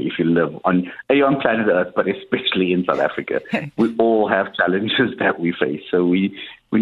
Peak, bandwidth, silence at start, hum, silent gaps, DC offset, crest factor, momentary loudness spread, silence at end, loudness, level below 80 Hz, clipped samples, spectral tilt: -2 dBFS; 5.6 kHz; 0 s; none; none; under 0.1%; 18 dB; 6 LU; 0 s; -19 LUFS; -56 dBFS; under 0.1%; -8 dB/octave